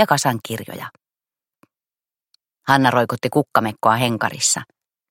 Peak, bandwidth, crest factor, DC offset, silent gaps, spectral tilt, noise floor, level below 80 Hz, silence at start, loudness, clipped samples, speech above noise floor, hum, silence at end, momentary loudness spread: 0 dBFS; 17 kHz; 20 dB; under 0.1%; none; -3.5 dB/octave; under -90 dBFS; -62 dBFS; 0 s; -19 LUFS; under 0.1%; over 71 dB; none; 0.45 s; 14 LU